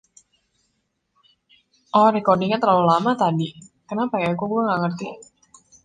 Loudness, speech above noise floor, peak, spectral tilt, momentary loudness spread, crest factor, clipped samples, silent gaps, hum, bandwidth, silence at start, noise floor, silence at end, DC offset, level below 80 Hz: -20 LUFS; 53 dB; -4 dBFS; -7 dB/octave; 13 LU; 18 dB; under 0.1%; none; none; 9.6 kHz; 1.95 s; -72 dBFS; 0.6 s; under 0.1%; -66 dBFS